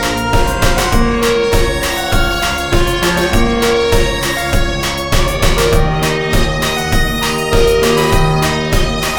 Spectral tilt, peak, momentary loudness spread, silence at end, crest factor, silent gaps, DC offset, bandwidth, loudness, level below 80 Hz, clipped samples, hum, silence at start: -4.5 dB/octave; 0 dBFS; 3 LU; 0 s; 12 dB; none; under 0.1%; 20 kHz; -14 LUFS; -18 dBFS; under 0.1%; none; 0 s